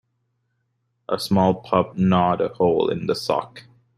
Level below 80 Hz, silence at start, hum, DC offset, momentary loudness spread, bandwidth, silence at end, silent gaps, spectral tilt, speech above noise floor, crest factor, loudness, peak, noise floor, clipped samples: -58 dBFS; 1.1 s; none; under 0.1%; 8 LU; 12.5 kHz; 0.4 s; none; -7 dB/octave; 52 dB; 20 dB; -21 LUFS; -2 dBFS; -72 dBFS; under 0.1%